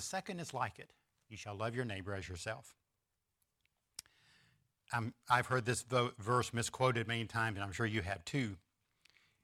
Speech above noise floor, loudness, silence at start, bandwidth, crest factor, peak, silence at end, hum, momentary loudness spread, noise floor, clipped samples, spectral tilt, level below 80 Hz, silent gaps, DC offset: 48 dB; -38 LUFS; 0 s; 15.5 kHz; 24 dB; -16 dBFS; 0.85 s; none; 17 LU; -87 dBFS; under 0.1%; -4.5 dB/octave; -66 dBFS; none; under 0.1%